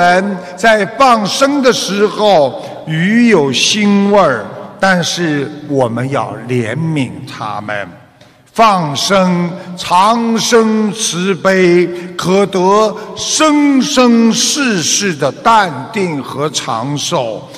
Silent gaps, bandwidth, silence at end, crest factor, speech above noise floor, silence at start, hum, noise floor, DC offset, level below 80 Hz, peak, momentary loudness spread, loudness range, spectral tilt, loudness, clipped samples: none; 15 kHz; 0 s; 12 dB; 32 dB; 0 s; none; -44 dBFS; under 0.1%; -50 dBFS; 0 dBFS; 10 LU; 5 LU; -4 dB/octave; -12 LUFS; under 0.1%